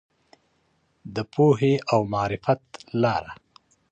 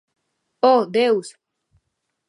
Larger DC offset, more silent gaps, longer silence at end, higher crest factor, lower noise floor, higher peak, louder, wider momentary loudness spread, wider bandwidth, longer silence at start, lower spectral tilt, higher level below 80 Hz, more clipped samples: neither; neither; second, 0.55 s vs 1 s; about the same, 18 dB vs 20 dB; second, -68 dBFS vs -75 dBFS; second, -8 dBFS vs -2 dBFS; second, -24 LUFS vs -18 LUFS; first, 13 LU vs 9 LU; second, 8.8 kHz vs 11.5 kHz; first, 1.05 s vs 0.65 s; first, -7.5 dB/octave vs -4.5 dB/octave; first, -56 dBFS vs -74 dBFS; neither